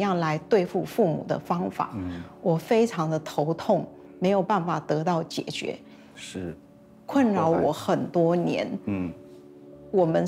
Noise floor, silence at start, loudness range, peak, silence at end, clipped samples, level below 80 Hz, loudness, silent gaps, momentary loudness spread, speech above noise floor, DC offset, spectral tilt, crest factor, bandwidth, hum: -47 dBFS; 0 s; 2 LU; -10 dBFS; 0 s; under 0.1%; -62 dBFS; -26 LUFS; none; 13 LU; 22 dB; under 0.1%; -7 dB/octave; 16 dB; 15.5 kHz; none